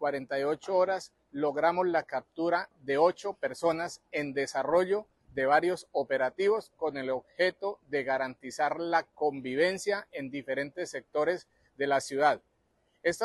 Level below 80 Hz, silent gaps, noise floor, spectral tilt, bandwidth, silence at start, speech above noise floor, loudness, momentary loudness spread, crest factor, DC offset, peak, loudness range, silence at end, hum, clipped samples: -72 dBFS; none; -73 dBFS; -4.5 dB/octave; 12.5 kHz; 0 s; 43 dB; -30 LUFS; 9 LU; 18 dB; under 0.1%; -12 dBFS; 2 LU; 0 s; none; under 0.1%